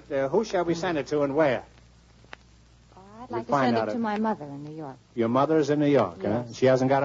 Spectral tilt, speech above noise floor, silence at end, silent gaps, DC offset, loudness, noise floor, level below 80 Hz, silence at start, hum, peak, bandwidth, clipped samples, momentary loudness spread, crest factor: -6.5 dB/octave; 30 dB; 0 s; none; under 0.1%; -25 LUFS; -55 dBFS; -60 dBFS; 0.1 s; none; -10 dBFS; 7.8 kHz; under 0.1%; 14 LU; 16 dB